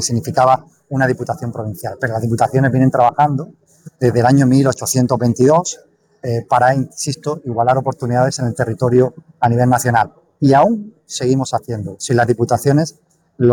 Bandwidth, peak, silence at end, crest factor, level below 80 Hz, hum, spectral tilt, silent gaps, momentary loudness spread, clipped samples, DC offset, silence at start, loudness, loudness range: 19 kHz; -2 dBFS; 0 s; 14 dB; -50 dBFS; none; -6 dB/octave; none; 11 LU; under 0.1%; under 0.1%; 0 s; -16 LUFS; 2 LU